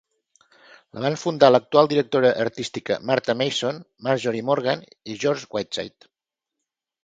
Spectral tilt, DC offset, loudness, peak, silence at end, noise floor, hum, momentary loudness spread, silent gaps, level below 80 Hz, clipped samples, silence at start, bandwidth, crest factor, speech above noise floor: -5 dB/octave; under 0.1%; -22 LUFS; 0 dBFS; 1.15 s; -85 dBFS; none; 13 LU; none; -66 dBFS; under 0.1%; 0.95 s; 9.2 kHz; 22 dB; 63 dB